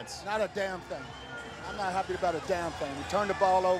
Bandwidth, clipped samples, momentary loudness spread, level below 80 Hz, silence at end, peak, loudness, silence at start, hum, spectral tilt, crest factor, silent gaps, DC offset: 14.5 kHz; under 0.1%; 14 LU; -54 dBFS; 0 s; -12 dBFS; -32 LUFS; 0 s; none; -4.5 dB/octave; 18 dB; none; under 0.1%